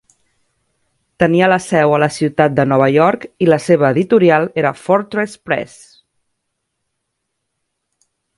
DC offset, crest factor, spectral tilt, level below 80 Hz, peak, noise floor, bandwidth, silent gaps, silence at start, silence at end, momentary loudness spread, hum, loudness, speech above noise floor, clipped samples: under 0.1%; 16 dB; -6.5 dB/octave; -54 dBFS; 0 dBFS; -73 dBFS; 11.5 kHz; none; 1.2 s; 2.7 s; 9 LU; none; -14 LUFS; 60 dB; under 0.1%